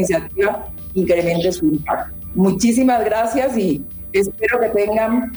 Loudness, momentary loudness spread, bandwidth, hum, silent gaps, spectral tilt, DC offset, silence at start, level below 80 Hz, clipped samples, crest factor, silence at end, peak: -18 LUFS; 8 LU; over 20 kHz; none; none; -5.5 dB/octave; under 0.1%; 0 s; -42 dBFS; under 0.1%; 12 dB; 0 s; -4 dBFS